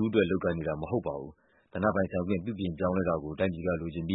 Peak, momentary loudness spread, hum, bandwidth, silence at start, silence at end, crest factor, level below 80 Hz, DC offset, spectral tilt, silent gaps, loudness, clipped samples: -10 dBFS; 8 LU; none; 4 kHz; 0 s; 0 s; 20 dB; -54 dBFS; under 0.1%; -11 dB/octave; none; -31 LUFS; under 0.1%